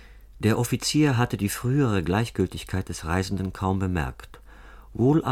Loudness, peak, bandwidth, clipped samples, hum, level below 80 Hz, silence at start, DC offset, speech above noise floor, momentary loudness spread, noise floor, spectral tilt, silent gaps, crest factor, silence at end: -25 LUFS; -8 dBFS; 16.5 kHz; under 0.1%; none; -44 dBFS; 0 s; under 0.1%; 22 dB; 9 LU; -46 dBFS; -6 dB/octave; none; 16 dB; 0 s